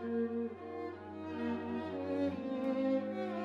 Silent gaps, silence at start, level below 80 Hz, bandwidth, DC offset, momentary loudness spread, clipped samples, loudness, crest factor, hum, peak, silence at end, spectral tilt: none; 0 s; -74 dBFS; 7.2 kHz; under 0.1%; 9 LU; under 0.1%; -38 LUFS; 14 dB; none; -24 dBFS; 0 s; -8 dB/octave